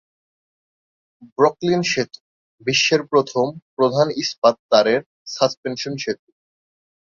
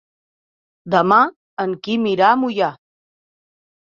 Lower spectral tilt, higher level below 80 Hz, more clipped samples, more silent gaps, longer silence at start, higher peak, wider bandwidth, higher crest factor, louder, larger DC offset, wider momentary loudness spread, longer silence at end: second, -4 dB/octave vs -6.5 dB/octave; about the same, -62 dBFS vs -66 dBFS; neither; first, 1.32-1.36 s, 2.20-2.58 s, 3.62-3.77 s, 4.38-4.42 s, 4.59-4.69 s, 5.06-5.26 s, 5.57-5.63 s vs 1.36-1.57 s; first, 1.2 s vs 0.85 s; about the same, 0 dBFS vs -2 dBFS; about the same, 7.6 kHz vs 7.4 kHz; about the same, 22 dB vs 18 dB; about the same, -19 LUFS vs -17 LUFS; neither; about the same, 11 LU vs 10 LU; second, 1.05 s vs 1.2 s